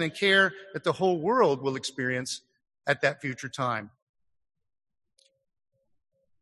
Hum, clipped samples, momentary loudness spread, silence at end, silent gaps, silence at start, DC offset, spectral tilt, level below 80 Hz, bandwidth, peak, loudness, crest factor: none; under 0.1%; 13 LU; 2.55 s; none; 0 s; under 0.1%; -4 dB/octave; -72 dBFS; 12 kHz; -8 dBFS; -27 LUFS; 20 dB